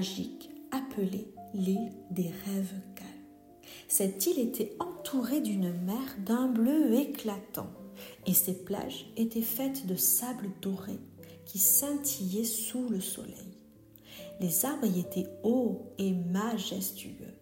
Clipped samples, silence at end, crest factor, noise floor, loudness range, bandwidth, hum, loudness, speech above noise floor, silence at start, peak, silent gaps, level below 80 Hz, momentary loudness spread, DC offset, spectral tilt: under 0.1%; 0 s; 22 dB; -56 dBFS; 4 LU; 16.5 kHz; none; -31 LUFS; 25 dB; 0 s; -12 dBFS; none; -70 dBFS; 19 LU; under 0.1%; -4.5 dB/octave